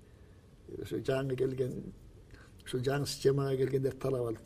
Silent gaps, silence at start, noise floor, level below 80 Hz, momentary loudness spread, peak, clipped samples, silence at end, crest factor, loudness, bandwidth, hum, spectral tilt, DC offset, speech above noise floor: none; 0 s; -57 dBFS; -58 dBFS; 15 LU; -16 dBFS; under 0.1%; 0 s; 18 dB; -33 LUFS; 15.5 kHz; none; -6 dB/octave; under 0.1%; 24 dB